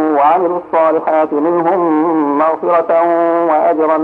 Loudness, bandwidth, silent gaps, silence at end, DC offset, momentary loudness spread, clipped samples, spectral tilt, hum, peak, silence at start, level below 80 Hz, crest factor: -13 LUFS; 4.5 kHz; none; 0 s; under 0.1%; 2 LU; under 0.1%; -8.5 dB/octave; none; -2 dBFS; 0 s; -62 dBFS; 10 dB